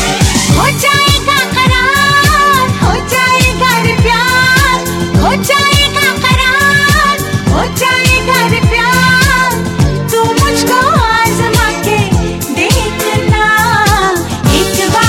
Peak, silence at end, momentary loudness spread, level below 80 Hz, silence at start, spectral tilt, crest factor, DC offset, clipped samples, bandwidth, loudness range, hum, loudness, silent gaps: 0 dBFS; 0 s; 5 LU; -22 dBFS; 0 s; -4 dB/octave; 10 dB; under 0.1%; under 0.1%; 17 kHz; 2 LU; none; -9 LUFS; none